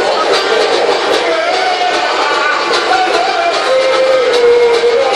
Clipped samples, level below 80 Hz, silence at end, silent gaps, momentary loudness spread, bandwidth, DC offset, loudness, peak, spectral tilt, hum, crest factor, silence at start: under 0.1%; -52 dBFS; 0 s; none; 3 LU; 11.5 kHz; under 0.1%; -11 LUFS; 0 dBFS; -1.5 dB/octave; none; 12 dB; 0 s